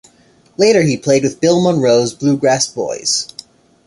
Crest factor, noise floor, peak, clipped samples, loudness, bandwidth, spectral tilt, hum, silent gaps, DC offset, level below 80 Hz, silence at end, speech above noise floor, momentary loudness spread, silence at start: 14 dB; -50 dBFS; -2 dBFS; under 0.1%; -14 LUFS; 11.5 kHz; -4.5 dB/octave; none; none; under 0.1%; -54 dBFS; 0.6 s; 37 dB; 6 LU; 0.6 s